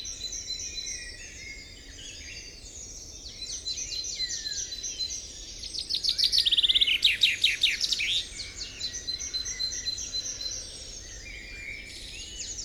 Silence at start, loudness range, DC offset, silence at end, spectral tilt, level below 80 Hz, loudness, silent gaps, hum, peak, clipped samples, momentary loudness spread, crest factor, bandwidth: 0 s; 14 LU; under 0.1%; 0 s; 1 dB/octave; -50 dBFS; -27 LUFS; none; none; -10 dBFS; under 0.1%; 20 LU; 22 dB; 18.5 kHz